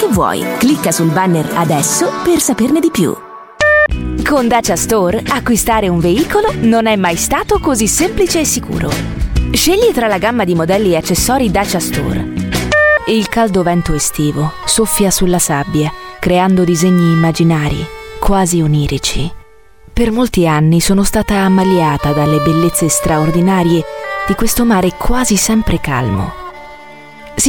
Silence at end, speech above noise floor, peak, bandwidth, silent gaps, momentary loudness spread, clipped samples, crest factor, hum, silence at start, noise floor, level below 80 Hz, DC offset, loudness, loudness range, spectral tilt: 0 s; 31 dB; 0 dBFS; 17.5 kHz; none; 7 LU; under 0.1%; 12 dB; none; 0 s; -42 dBFS; -26 dBFS; under 0.1%; -12 LUFS; 2 LU; -4.5 dB/octave